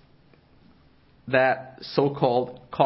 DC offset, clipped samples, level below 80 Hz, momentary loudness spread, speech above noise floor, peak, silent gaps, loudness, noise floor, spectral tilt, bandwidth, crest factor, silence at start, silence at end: under 0.1%; under 0.1%; -62 dBFS; 10 LU; 33 dB; -4 dBFS; none; -24 LUFS; -57 dBFS; -10 dB/octave; 5.8 kHz; 22 dB; 1.25 s; 0 s